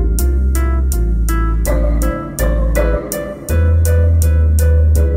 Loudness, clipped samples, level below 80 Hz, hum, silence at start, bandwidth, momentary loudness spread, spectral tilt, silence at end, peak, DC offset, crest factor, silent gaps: -15 LUFS; under 0.1%; -14 dBFS; none; 0 s; 16.5 kHz; 7 LU; -6.5 dB/octave; 0 s; 0 dBFS; under 0.1%; 12 dB; none